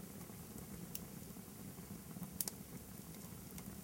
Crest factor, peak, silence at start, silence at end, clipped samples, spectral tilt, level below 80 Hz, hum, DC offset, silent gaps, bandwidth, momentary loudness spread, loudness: 32 dB; -18 dBFS; 0 s; 0 s; under 0.1%; -4 dB/octave; -66 dBFS; none; under 0.1%; none; 17 kHz; 9 LU; -49 LUFS